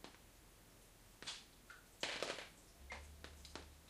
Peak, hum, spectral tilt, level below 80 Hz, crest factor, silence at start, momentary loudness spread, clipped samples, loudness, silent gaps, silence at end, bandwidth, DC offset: -22 dBFS; none; -2 dB/octave; -66 dBFS; 30 dB; 0 s; 19 LU; under 0.1%; -50 LUFS; none; 0 s; 15.5 kHz; under 0.1%